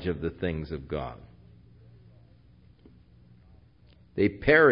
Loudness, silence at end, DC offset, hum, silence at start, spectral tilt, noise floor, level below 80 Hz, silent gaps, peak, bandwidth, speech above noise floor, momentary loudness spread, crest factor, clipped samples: -28 LUFS; 0 s; under 0.1%; none; 0 s; -10.5 dB/octave; -57 dBFS; -48 dBFS; none; -6 dBFS; 5.4 kHz; 32 dB; 19 LU; 24 dB; under 0.1%